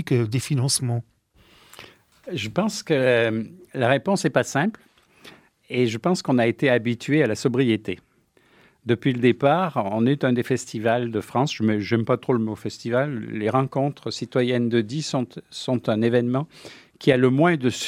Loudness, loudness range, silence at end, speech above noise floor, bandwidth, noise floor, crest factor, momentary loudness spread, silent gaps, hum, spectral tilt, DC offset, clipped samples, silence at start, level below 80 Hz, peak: -23 LUFS; 2 LU; 0 s; 38 dB; 15.5 kHz; -60 dBFS; 20 dB; 9 LU; none; none; -5.5 dB/octave; under 0.1%; under 0.1%; 0 s; -66 dBFS; -2 dBFS